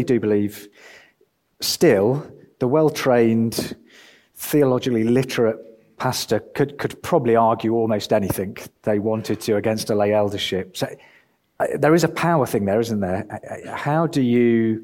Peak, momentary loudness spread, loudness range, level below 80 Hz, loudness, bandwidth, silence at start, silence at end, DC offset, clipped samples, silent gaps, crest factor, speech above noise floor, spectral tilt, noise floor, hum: -4 dBFS; 11 LU; 2 LU; -56 dBFS; -20 LUFS; 17 kHz; 0 s; 0 s; under 0.1%; under 0.1%; none; 16 dB; 44 dB; -5.5 dB/octave; -64 dBFS; none